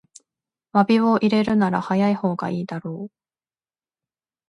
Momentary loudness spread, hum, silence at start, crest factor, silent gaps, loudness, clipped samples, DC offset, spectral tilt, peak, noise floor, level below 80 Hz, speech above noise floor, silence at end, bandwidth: 14 LU; none; 0.75 s; 18 dB; none; -21 LUFS; under 0.1%; under 0.1%; -7.5 dB/octave; -4 dBFS; under -90 dBFS; -62 dBFS; over 70 dB; 1.45 s; 10.5 kHz